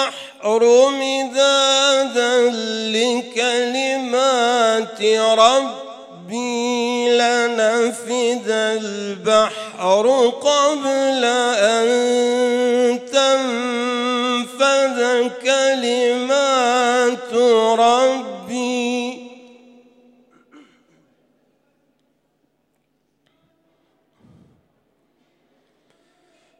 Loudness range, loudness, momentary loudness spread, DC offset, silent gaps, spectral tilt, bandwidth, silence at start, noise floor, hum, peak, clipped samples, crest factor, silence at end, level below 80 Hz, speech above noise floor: 3 LU; -17 LUFS; 9 LU; under 0.1%; none; -2 dB/octave; 12 kHz; 0 s; -68 dBFS; none; 0 dBFS; under 0.1%; 18 dB; 7.25 s; -76 dBFS; 51 dB